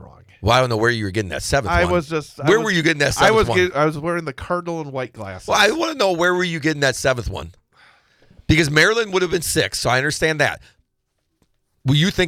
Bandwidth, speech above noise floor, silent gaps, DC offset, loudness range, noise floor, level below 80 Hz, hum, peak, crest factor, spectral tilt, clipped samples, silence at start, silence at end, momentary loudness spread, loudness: 17.5 kHz; 53 dB; none; under 0.1%; 2 LU; -72 dBFS; -40 dBFS; none; -4 dBFS; 16 dB; -4.5 dB/octave; under 0.1%; 0 s; 0 s; 12 LU; -18 LUFS